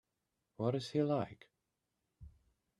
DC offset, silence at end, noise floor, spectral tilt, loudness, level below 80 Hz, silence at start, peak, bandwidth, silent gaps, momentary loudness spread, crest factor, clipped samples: under 0.1%; 0.5 s; -87 dBFS; -7.5 dB/octave; -37 LUFS; -70 dBFS; 0.6 s; -20 dBFS; 11.5 kHz; none; 6 LU; 20 dB; under 0.1%